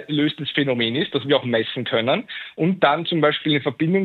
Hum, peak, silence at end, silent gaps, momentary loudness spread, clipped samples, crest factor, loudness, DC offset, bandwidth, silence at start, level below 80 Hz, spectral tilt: none; -4 dBFS; 0 s; none; 5 LU; under 0.1%; 18 dB; -21 LUFS; under 0.1%; 4.5 kHz; 0 s; -70 dBFS; -8 dB/octave